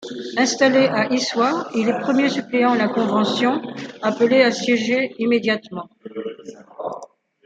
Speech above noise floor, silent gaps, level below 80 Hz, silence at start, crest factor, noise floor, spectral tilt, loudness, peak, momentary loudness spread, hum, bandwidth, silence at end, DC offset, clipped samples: 23 dB; none; -68 dBFS; 0 s; 18 dB; -41 dBFS; -4 dB/octave; -19 LUFS; -2 dBFS; 17 LU; none; 9 kHz; 0.4 s; under 0.1%; under 0.1%